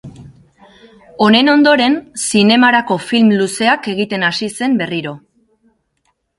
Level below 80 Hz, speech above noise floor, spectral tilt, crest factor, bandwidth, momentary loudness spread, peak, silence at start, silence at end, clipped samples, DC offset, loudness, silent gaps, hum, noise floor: -56 dBFS; 52 dB; -4 dB/octave; 14 dB; 11.5 kHz; 9 LU; 0 dBFS; 0.05 s; 1.2 s; under 0.1%; under 0.1%; -13 LUFS; none; none; -65 dBFS